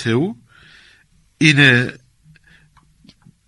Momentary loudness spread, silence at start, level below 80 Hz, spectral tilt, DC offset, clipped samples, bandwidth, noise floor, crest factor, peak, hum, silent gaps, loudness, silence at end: 15 LU; 0 s; -56 dBFS; -5 dB/octave; under 0.1%; under 0.1%; 11.5 kHz; -54 dBFS; 20 dB; 0 dBFS; none; none; -14 LUFS; 1.55 s